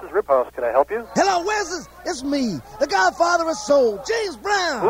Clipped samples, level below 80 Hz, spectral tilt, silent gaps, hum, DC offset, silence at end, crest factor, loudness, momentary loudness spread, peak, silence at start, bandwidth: under 0.1%; -50 dBFS; -3 dB/octave; none; 60 Hz at -50 dBFS; under 0.1%; 0 s; 16 dB; -21 LUFS; 8 LU; -4 dBFS; 0 s; 16 kHz